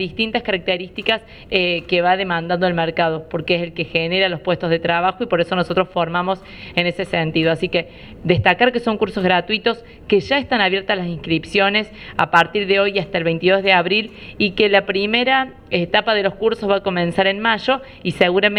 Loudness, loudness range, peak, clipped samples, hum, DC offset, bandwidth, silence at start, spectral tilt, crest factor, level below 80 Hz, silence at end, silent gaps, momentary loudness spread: -18 LUFS; 3 LU; 0 dBFS; under 0.1%; none; under 0.1%; 11 kHz; 0 s; -6 dB/octave; 18 dB; -46 dBFS; 0 s; none; 7 LU